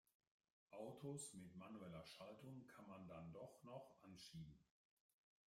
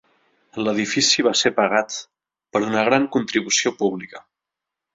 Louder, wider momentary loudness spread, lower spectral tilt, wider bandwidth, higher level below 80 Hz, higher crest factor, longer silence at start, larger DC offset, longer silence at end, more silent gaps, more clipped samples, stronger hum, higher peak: second, -59 LUFS vs -20 LUFS; second, 8 LU vs 14 LU; first, -5 dB/octave vs -2.5 dB/octave; first, 16 kHz vs 7.8 kHz; second, -84 dBFS vs -64 dBFS; about the same, 18 dB vs 20 dB; first, 0.7 s vs 0.55 s; neither; about the same, 0.85 s vs 0.75 s; neither; neither; neither; second, -42 dBFS vs -2 dBFS